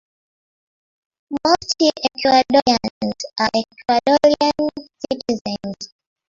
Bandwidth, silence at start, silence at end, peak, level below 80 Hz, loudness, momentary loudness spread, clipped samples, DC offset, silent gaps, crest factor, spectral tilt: 7.6 kHz; 1.3 s; 0.4 s; -2 dBFS; -54 dBFS; -18 LUFS; 14 LU; under 0.1%; under 0.1%; 2.90-3.01 s, 5.41-5.45 s; 18 dB; -3.5 dB/octave